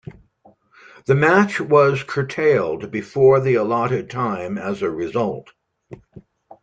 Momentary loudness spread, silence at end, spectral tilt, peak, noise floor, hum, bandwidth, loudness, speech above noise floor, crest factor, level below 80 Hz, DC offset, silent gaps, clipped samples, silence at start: 11 LU; 0.4 s; -7 dB/octave; -2 dBFS; -55 dBFS; none; 8.8 kHz; -19 LUFS; 37 dB; 18 dB; -58 dBFS; under 0.1%; none; under 0.1%; 1.1 s